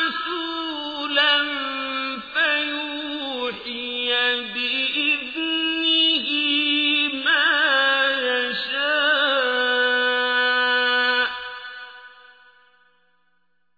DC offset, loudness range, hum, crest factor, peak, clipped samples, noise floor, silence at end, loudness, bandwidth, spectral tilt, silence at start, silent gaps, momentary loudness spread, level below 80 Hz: under 0.1%; 5 LU; none; 16 dB; -6 dBFS; under 0.1%; -71 dBFS; 1.65 s; -20 LUFS; 5 kHz; -3 dB/octave; 0 s; none; 10 LU; -66 dBFS